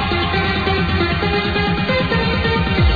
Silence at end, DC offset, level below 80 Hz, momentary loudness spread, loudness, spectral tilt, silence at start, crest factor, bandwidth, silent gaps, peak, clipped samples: 0 s; 0.7%; -26 dBFS; 1 LU; -17 LUFS; -7.5 dB/octave; 0 s; 12 dB; 4.9 kHz; none; -4 dBFS; under 0.1%